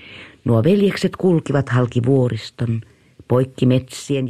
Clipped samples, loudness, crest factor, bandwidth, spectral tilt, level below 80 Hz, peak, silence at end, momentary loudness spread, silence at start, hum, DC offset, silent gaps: under 0.1%; -18 LUFS; 16 dB; 13 kHz; -7.5 dB/octave; -52 dBFS; -4 dBFS; 0 s; 8 LU; 0.05 s; none; under 0.1%; none